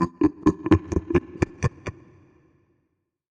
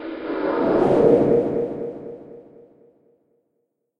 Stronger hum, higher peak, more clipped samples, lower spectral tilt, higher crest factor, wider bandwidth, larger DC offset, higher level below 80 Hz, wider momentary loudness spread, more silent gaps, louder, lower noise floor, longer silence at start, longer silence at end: neither; about the same, -6 dBFS vs -4 dBFS; neither; about the same, -8 dB/octave vs -9 dB/octave; about the same, 20 dB vs 18 dB; first, 9 kHz vs 6.2 kHz; neither; first, -42 dBFS vs -52 dBFS; second, 10 LU vs 20 LU; neither; second, -24 LUFS vs -20 LUFS; about the same, -76 dBFS vs -74 dBFS; about the same, 0 s vs 0 s; second, 1.4 s vs 1.6 s